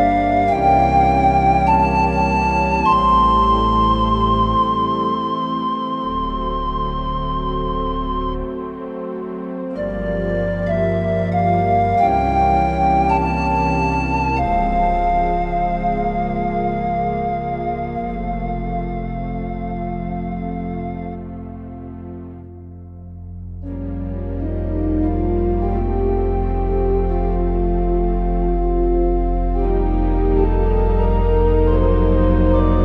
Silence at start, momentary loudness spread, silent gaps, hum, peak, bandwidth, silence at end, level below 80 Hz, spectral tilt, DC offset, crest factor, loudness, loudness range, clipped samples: 0 s; 13 LU; none; none; -2 dBFS; 6.6 kHz; 0 s; -24 dBFS; -8.5 dB/octave; under 0.1%; 16 dB; -19 LUFS; 11 LU; under 0.1%